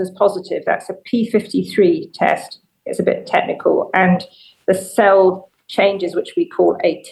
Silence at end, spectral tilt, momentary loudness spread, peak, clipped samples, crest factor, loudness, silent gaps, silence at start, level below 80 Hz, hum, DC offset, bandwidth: 0 s; -6 dB/octave; 10 LU; 0 dBFS; under 0.1%; 16 dB; -17 LUFS; none; 0 s; -66 dBFS; none; under 0.1%; 12.5 kHz